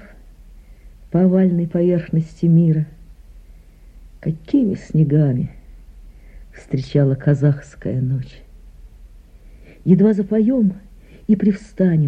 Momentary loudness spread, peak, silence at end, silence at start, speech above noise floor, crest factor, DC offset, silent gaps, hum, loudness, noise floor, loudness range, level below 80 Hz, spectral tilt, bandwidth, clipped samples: 12 LU; -2 dBFS; 0 s; 0.55 s; 27 dB; 16 dB; under 0.1%; none; none; -18 LUFS; -43 dBFS; 3 LU; -42 dBFS; -10 dB/octave; 7.8 kHz; under 0.1%